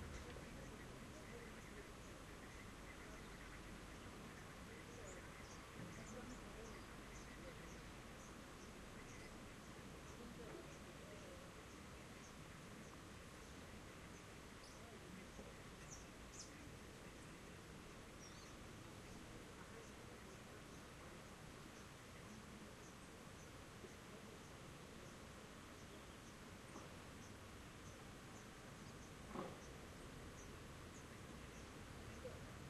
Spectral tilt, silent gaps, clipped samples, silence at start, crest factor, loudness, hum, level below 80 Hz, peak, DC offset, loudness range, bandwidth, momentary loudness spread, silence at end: -4 dB/octave; none; under 0.1%; 0 s; 22 dB; -57 LUFS; none; -66 dBFS; -34 dBFS; under 0.1%; 2 LU; 13 kHz; 3 LU; 0 s